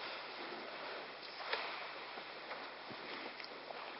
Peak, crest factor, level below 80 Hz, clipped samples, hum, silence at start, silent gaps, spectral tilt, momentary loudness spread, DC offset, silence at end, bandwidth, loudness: -22 dBFS; 24 dB; -84 dBFS; under 0.1%; none; 0 s; none; 0.5 dB/octave; 7 LU; under 0.1%; 0 s; 5.6 kHz; -46 LUFS